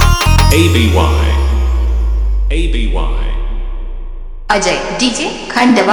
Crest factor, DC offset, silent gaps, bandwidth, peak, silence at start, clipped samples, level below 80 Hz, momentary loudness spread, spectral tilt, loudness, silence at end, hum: 12 dB; under 0.1%; none; over 20 kHz; 0 dBFS; 0 s; 0.1%; -14 dBFS; 16 LU; -5 dB/octave; -13 LUFS; 0 s; none